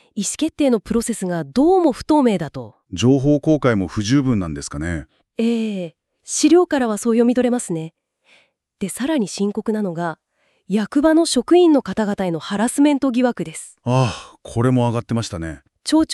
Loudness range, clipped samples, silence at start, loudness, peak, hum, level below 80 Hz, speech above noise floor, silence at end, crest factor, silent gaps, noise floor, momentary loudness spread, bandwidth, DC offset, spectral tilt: 4 LU; under 0.1%; 0.15 s; -19 LUFS; -4 dBFS; none; -46 dBFS; 39 dB; 0 s; 16 dB; none; -57 dBFS; 14 LU; 13 kHz; under 0.1%; -5.5 dB/octave